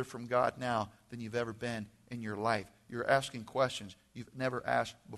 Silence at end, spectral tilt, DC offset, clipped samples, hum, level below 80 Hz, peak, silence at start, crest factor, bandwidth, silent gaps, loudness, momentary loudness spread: 0 s; -5 dB/octave; under 0.1%; under 0.1%; none; -68 dBFS; -14 dBFS; 0 s; 22 dB; 12 kHz; none; -35 LUFS; 14 LU